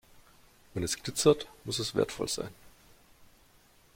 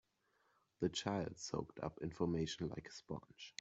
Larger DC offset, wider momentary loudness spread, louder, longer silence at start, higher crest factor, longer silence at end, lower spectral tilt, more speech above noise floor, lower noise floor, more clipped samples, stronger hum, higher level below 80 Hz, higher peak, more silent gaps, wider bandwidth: neither; about the same, 11 LU vs 11 LU; first, -31 LUFS vs -44 LUFS; second, 0.15 s vs 0.8 s; about the same, 22 dB vs 22 dB; first, 0.7 s vs 0.1 s; about the same, -4 dB/octave vs -5 dB/octave; second, 31 dB vs 36 dB; second, -62 dBFS vs -80 dBFS; neither; neither; first, -60 dBFS vs -68 dBFS; first, -10 dBFS vs -22 dBFS; neither; first, 16.5 kHz vs 8.2 kHz